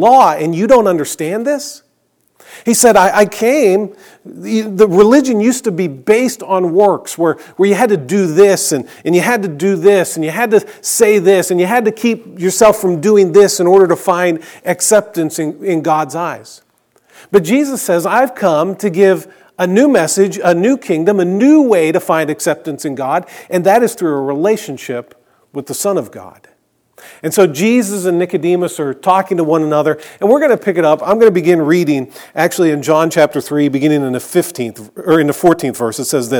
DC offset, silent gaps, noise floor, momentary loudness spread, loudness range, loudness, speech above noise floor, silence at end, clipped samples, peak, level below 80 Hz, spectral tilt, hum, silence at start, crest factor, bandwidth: under 0.1%; none; -60 dBFS; 10 LU; 5 LU; -12 LUFS; 48 dB; 0 s; 0.2%; 0 dBFS; -54 dBFS; -5 dB/octave; none; 0 s; 12 dB; 19.5 kHz